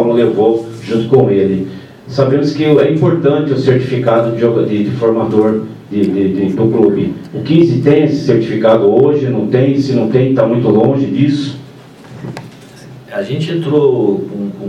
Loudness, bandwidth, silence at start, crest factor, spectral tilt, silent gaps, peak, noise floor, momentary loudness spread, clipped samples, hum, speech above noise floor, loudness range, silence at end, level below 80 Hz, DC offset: -12 LUFS; 9.6 kHz; 0 s; 12 dB; -8.5 dB/octave; none; 0 dBFS; -35 dBFS; 11 LU; 0.1%; none; 24 dB; 5 LU; 0 s; -52 dBFS; under 0.1%